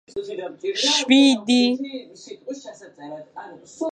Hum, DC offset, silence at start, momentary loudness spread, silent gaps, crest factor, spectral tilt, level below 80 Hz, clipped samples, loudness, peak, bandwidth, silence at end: none; under 0.1%; 0.15 s; 25 LU; none; 20 dB; -2 dB/octave; -72 dBFS; under 0.1%; -19 LUFS; -2 dBFS; 9.6 kHz; 0 s